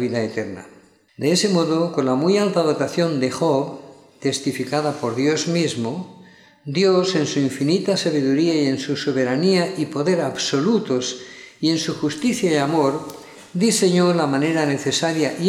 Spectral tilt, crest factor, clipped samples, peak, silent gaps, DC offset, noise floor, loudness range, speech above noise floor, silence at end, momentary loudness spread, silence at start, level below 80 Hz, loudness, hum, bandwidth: -5 dB/octave; 14 dB; under 0.1%; -6 dBFS; none; under 0.1%; -47 dBFS; 2 LU; 28 dB; 0 s; 10 LU; 0 s; -68 dBFS; -20 LUFS; none; 15 kHz